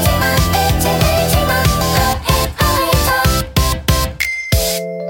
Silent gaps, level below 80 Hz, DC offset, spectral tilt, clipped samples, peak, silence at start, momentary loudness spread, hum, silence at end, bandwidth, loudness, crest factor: none; -22 dBFS; under 0.1%; -4 dB/octave; under 0.1%; 0 dBFS; 0 s; 3 LU; none; 0 s; 17 kHz; -14 LUFS; 14 dB